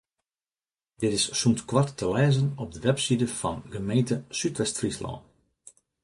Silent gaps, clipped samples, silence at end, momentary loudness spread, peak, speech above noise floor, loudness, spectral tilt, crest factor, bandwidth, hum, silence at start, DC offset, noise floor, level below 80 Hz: none; under 0.1%; 0.85 s; 8 LU; -8 dBFS; over 64 dB; -26 LUFS; -5 dB/octave; 20 dB; 11.5 kHz; none; 1 s; under 0.1%; under -90 dBFS; -54 dBFS